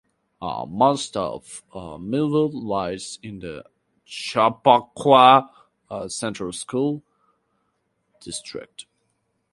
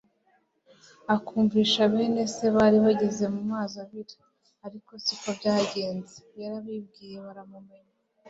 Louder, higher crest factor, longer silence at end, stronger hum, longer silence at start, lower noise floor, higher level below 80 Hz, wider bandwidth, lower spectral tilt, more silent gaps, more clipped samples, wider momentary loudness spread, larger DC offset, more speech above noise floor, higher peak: first, -21 LUFS vs -25 LUFS; about the same, 22 dB vs 20 dB; about the same, 0.7 s vs 0.65 s; neither; second, 0.4 s vs 1.1 s; first, -72 dBFS vs -68 dBFS; first, -58 dBFS vs -64 dBFS; first, 11.5 kHz vs 8 kHz; about the same, -4.5 dB/octave vs -5 dB/octave; neither; neither; about the same, 21 LU vs 22 LU; neither; first, 50 dB vs 42 dB; first, 0 dBFS vs -8 dBFS